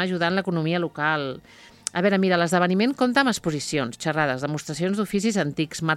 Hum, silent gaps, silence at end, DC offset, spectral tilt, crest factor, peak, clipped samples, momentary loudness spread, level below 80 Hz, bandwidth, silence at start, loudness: none; none; 0 s; under 0.1%; -5 dB/octave; 22 dB; -2 dBFS; under 0.1%; 7 LU; -60 dBFS; 14 kHz; 0 s; -23 LUFS